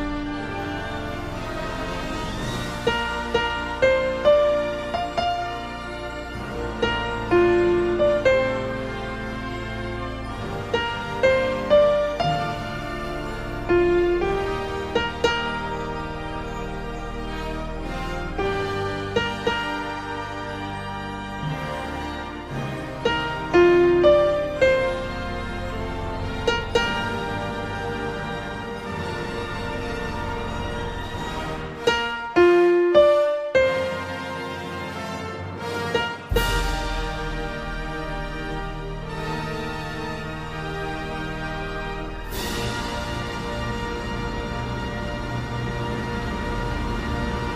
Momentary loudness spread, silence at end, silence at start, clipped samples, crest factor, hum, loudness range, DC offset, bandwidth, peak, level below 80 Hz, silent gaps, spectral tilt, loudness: 12 LU; 0 s; 0 s; under 0.1%; 20 dB; none; 9 LU; under 0.1%; 15.5 kHz; -4 dBFS; -36 dBFS; none; -5.5 dB/octave; -25 LUFS